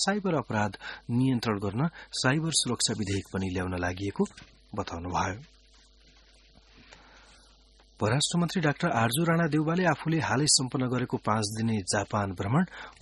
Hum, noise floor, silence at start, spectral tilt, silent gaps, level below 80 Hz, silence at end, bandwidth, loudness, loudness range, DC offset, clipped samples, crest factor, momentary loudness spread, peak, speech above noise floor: none; -58 dBFS; 0 s; -4.5 dB/octave; none; -56 dBFS; 0.1 s; 11.5 kHz; -28 LUFS; 11 LU; under 0.1%; under 0.1%; 20 dB; 8 LU; -8 dBFS; 30 dB